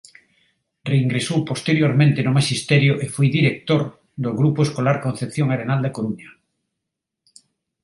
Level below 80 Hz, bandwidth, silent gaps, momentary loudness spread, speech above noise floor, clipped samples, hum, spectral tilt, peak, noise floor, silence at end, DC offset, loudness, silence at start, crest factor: -60 dBFS; 11.5 kHz; none; 10 LU; 63 dB; under 0.1%; none; -6 dB/octave; -2 dBFS; -82 dBFS; 1.55 s; under 0.1%; -20 LUFS; 0.85 s; 18 dB